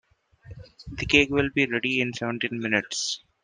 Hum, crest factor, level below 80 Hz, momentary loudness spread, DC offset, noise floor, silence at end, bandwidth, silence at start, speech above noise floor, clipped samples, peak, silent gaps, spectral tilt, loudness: none; 22 dB; -48 dBFS; 12 LU; under 0.1%; -48 dBFS; 0.25 s; 10 kHz; 0.45 s; 23 dB; under 0.1%; -4 dBFS; none; -3.5 dB/octave; -24 LUFS